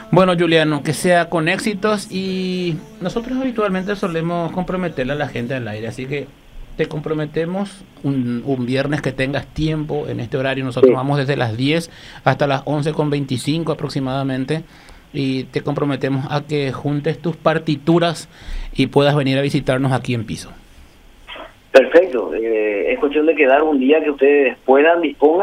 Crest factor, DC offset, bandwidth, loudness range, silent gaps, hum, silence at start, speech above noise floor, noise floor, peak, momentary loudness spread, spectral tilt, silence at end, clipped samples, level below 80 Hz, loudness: 18 dB; under 0.1%; 15.5 kHz; 7 LU; none; none; 0 s; 26 dB; -44 dBFS; 0 dBFS; 12 LU; -6.5 dB/octave; 0 s; under 0.1%; -42 dBFS; -18 LUFS